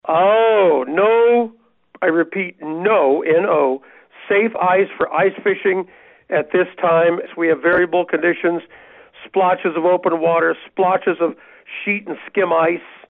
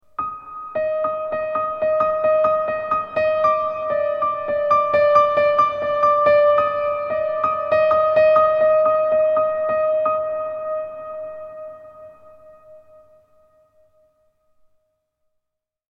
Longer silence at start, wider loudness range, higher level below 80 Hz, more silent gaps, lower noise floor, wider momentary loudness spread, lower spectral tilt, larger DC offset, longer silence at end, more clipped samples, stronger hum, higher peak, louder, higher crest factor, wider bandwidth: second, 0.05 s vs 0.2 s; second, 2 LU vs 11 LU; second, -64 dBFS vs -58 dBFS; neither; second, -50 dBFS vs -81 dBFS; second, 9 LU vs 14 LU; second, -3.5 dB/octave vs -6 dB/octave; neither; second, 0.2 s vs 3.25 s; neither; neither; about the same, -6 dBFS vs -4 dBFS; about the same, -17 LUFS vs -19 LUFS; about the same, 12 dB vs 16 dB; second, 4 kHz vs 5.8 kHz